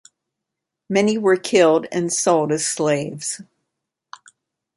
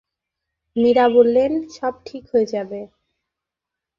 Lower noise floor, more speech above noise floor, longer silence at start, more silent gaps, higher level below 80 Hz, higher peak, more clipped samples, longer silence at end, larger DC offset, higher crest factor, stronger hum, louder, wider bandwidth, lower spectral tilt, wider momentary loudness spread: about the same, -82 dBFS vs -85 dBFS; about the same, 64 dB vs 67 dB; first, 0.9 s vs 0.75 s; neither; second, -68 dBFS vs -58 dBFS; about the same, -2 dBFS vs -2 dBFS; neither; first, 1.35 s vs 1.15 s; neither; about the same, 18 dB vs 18 dB; neither; about the same, -19 LUFS vs -18 LUFS; first, 11.5 kHz vs 7 kHz; second, -4 dB/octave vs -6 dB/octave; second, 11 LU vs 17 LU